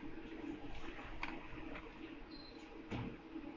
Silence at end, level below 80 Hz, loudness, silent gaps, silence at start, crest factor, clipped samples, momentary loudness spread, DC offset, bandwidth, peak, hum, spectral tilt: 0 s; -58 dBFS; -50 LUFS; none; 0 s; 20 dB; under 0.1%; 7 LU; under 0.1%; 7.4 kHz; -26 dBFS; none; -6.5 dB/octave